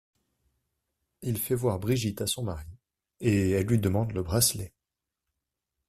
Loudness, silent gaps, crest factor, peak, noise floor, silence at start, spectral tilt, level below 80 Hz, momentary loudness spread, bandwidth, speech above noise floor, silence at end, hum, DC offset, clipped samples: -28 LUFS; none; 20 dB; -10 dBFS; -88 dBFS; 1.2 s; -5 dB/octave; -52 dBFS; 13 LU; 15.5 kHz; 60 dB; 1.2 s; none; under 0.1%; under 0.1%